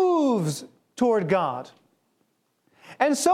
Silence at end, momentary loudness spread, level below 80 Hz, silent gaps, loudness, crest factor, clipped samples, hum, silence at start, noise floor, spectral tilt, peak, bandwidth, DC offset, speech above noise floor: 0 s; 16 LU; -70 dBFS; none; -24 LUFS; 20 dB; under 0.1%; none; 0 s; -71 dBFS; -5 dB/octave; -4 dBFS; 16 kHz; under 0.1%; 48 dB